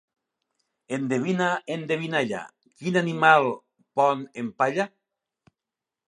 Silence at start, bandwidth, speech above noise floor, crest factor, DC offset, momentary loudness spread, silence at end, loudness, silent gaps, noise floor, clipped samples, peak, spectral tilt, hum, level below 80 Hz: 0.9 s; 11 kHz; 65 dB; 24 dB; under 0.1%; 16 LU; 1.2 s; -25 LUFS; none; -88 dBFS; under 0.1%; -2 dBFS; -5.5 dB/octave; none; -76 dBFS